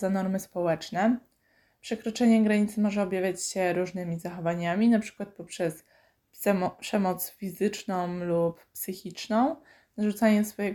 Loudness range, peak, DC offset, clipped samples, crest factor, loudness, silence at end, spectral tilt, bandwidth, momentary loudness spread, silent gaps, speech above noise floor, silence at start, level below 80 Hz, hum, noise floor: 4 LU; -10 dBFS; under 0.1%; under 0.1%; 16 dB; -28 LUFS; 0 s; -5.5 dB/octave; 19 kHz; 13 LU; none; 40 dB; 0 s; -66 dBFS; none; -68 dBFS